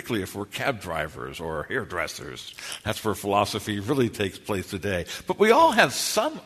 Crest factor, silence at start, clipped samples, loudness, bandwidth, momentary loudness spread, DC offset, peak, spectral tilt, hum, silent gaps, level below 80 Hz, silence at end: 24 dB; 0 s; under 0.1%; -25 LUFS; 13.5 kHz; 14 LU; under 0.1%; -2 dBFS; -4 dB/octave; none; none; -54 dBFS; 0 s